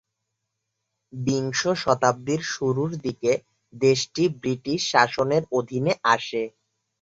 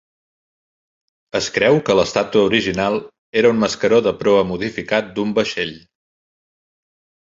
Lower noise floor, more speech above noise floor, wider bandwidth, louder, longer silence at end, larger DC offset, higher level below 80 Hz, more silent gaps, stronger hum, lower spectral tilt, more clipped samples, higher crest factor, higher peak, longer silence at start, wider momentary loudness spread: second, -80 dBFS vs under -90 dBFS; second, 57 dB vs over 73 dB; about the same, 8 kHz vs 7.8 kHz; second, -24 LUFS vs -18 LUFS; second, 0.5 s vs 1.5 s; neither; second, -62 dBFS vs -52 dBFS; second, none vs 3.18-3.33 s; neither; about the same, -4.5 dB/octave vs -4.5 dB/octave; neither; about the same, 22 dB vs 18 dB; about the same, -2 dBFS vs -2 dBFS; second, 1.15 s vs 1.35 s; about the same, 8 LU vs 8 LU